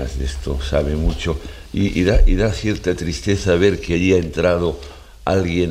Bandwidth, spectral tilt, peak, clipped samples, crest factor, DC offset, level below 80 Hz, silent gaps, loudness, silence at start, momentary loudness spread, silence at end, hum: 11.5 kHz; -6 dB/octave; -2 dBFS; under 0.1%; 16 dB; under 0.1%; -24 dBFS; none; -19 LUFS; 0 s; 9 LU; 0 s; none